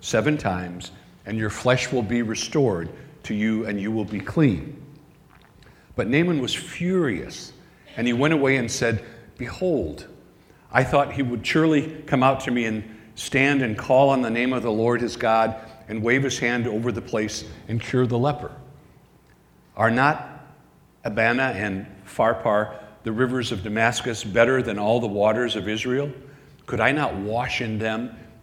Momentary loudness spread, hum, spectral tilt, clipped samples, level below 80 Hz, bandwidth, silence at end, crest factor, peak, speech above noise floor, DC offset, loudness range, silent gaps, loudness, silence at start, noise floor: 15 LU; none; -5.5 dB/octave; under 0.1%; -52 dBFS; 16 kHz; 0.15 s; 22 dB; 0 dBFS; 33 dB; under 0.1%; 4 LU; none; -23 LUFS; 0 s; -55 dBFS